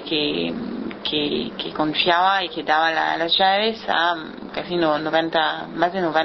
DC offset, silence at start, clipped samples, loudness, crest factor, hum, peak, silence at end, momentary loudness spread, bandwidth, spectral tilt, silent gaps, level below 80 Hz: under 0.1%; 0 s; under 0.1%; -21 LUFS; 18 dB; none; -2 dBFS; 0 s; 10 LU; 6.2 kHz; -5.5 dB/octave; none; -56 dBFS